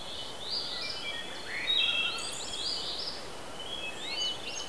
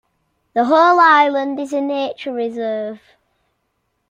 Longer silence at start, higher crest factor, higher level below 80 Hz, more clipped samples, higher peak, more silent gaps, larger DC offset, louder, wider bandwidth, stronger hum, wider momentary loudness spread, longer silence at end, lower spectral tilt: second, 0 s vs 0.55 s; about the same, 18 dB vs 16 dB; first, -60 dBFS vs -70 dBFS; neither; second, -16 dBFS vs -2 dBFS; neither; first, 0.7% vs under 0.1%; second, -32 LUFS vs -16 LUFS; about the same, 11 kHz vs 10.5 kHz; neither; about the same, 12 LU vs 13 LU; second, 0 s vs 1.15 s; second, -0.5 dB/octave vs -4 dB/octave